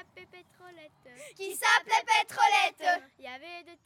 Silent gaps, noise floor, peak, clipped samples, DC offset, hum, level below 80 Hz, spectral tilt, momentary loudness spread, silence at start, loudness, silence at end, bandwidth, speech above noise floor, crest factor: none; -53 dBFS; -8 dBFS; under 0.1%; under 0.1%; none; -82 dBFS; 0.5 dB/octave; 20 LU; 0.15 s; -26 LUFS; 0.1 s; 18 kHz; 24 dB; 22 dB